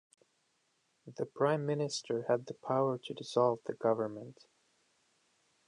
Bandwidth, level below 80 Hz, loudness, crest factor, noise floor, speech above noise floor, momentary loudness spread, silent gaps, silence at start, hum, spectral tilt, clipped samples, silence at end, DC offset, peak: 11 kHz; -84 dBFS; -34 LUFS; 20 dB; -77 dBFS; 43 dB; 11 LU; none; 1.05 s; none; -5.5 dB/octave; under 0.1%; 1.35 s; under 0.1%; -16 dBFS